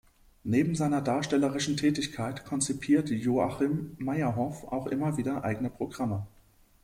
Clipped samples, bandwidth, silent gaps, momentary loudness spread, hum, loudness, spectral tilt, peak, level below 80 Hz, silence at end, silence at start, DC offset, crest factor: under 0.1%; 15.5 kHz; none; 7 LU; none; -30 LUFS; -5.5 dB/octave; -14 dBFS; -58 dBFS; 0.55 s; 0.45 s; under 0.1%; 16 dB